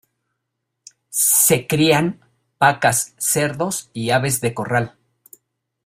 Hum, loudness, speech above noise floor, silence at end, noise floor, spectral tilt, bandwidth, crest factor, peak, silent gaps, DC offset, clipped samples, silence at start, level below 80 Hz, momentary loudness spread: none; -17 LUFS; 59 dB; 0.95 s; -77 dBFS; -3.5 dB/octave; 16 kHz; 20 dB; -2 dBFS; none; under 0.1%; under 0.1%; 1.1 s; -56 dBFS; 11 LU